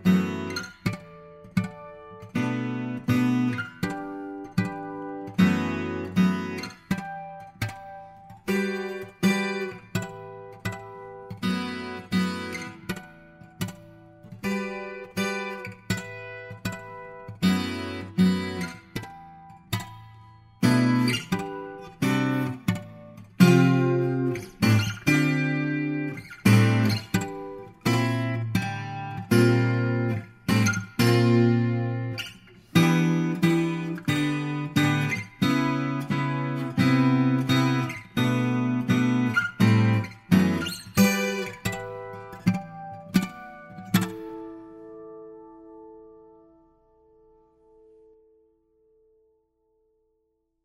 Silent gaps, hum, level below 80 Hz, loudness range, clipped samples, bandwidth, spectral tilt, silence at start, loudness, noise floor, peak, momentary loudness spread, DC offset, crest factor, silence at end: none; none; -58 dBFS; 9 LU; under 0.1%; 16 kHz; -6 dB/octave; 0 s; -25 LUFS; -74 dBFS; -4 dBFS; 18 LU; under 0.1%; 22 dB; 4.5 s